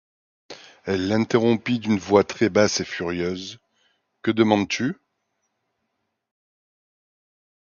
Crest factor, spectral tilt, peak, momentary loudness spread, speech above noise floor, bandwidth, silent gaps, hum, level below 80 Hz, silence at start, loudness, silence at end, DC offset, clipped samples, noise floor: 22 dB; -5 dB/octave; -4 dBFS; 16 LU; 56 dB; 7.2 kHz; none; none; -56 dBFS; 0.5 s; -22 LUFS; 2.8 s; under 0.1%; under 0.1%; -77 dBFS